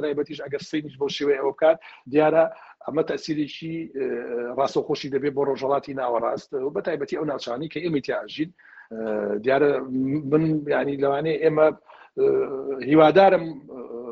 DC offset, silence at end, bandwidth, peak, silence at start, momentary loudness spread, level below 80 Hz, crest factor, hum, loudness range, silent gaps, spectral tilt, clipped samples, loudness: under 0.1%; 0 s; 7.6 kHz; -2 dBFS; 0 s; 12 LU; -64 dBFS; 20 dB; none; 6 LU; none; -5 dB/octave; under 0.1%; -23 LUFS